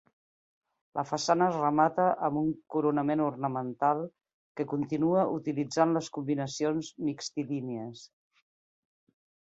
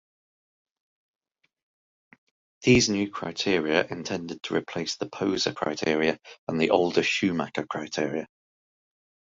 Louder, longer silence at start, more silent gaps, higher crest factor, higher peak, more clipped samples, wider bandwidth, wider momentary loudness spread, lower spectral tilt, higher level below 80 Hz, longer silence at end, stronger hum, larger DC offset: second, -30 LUFS vs -26 LUFS; second, 0.95 s vs 2.6 s; first, 4.34-4.55 s vs 6.38-6.47 s; about the same, 20 dB vs 24 dB; second, -10 dBFS vs -6 dBFS; neither; about the same, 8.2 kHz vs 7.8 kHz; about the same, 11 LU vs 11 LU; first, -6 dB/octave vs -4 dB/octave; second, -72 dBFS vs -56 dBFS; first, 1.45 s vs 1.1 s; neither; neither